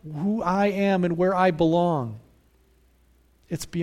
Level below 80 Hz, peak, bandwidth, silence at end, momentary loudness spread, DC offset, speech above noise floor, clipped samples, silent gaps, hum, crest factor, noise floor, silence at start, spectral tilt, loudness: -54 dBFS; -8 dBFS; 15.5 kHz; 0 s; 14 LU; under 0.1%; 37 dB; under 0.1%; none; none; 18 dB; -60 dBFS; 0.05 s; -7 dB/octave; -23 LUFS